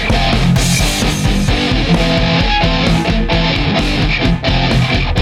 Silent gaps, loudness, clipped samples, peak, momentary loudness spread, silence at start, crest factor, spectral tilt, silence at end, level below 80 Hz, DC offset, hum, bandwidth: none; -13 LUFS; under 0.1%; 0 dBFS; 2 LU; 0 s; 12 dB; -5 dB/octave; 0 s; -18 dBFS; under 0.1%; none; 16 kHz